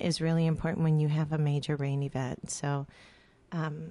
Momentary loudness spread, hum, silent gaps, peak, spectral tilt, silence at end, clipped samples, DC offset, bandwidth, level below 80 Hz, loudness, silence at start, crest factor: 8 LU; none; none; -16 dBFS; -6.5 dB/octave; 0 s; under 0.1%; under 0.1%; 11.5 kHz; -56 dBFS; -31 LUFS; 0 s; 14 dB